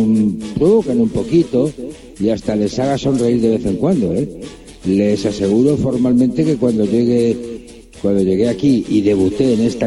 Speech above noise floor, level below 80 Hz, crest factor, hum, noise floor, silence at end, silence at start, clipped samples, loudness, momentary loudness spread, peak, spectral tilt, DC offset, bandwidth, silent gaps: 20 dB; -42 dBFS; 12 dB; none; -34 dBFS; 0 s; 0 s; under 0.1%; -16 LUFS; 8 LU; -2 dBFS; -7.5 dB/octave; under 0.1%; 12 kHz; none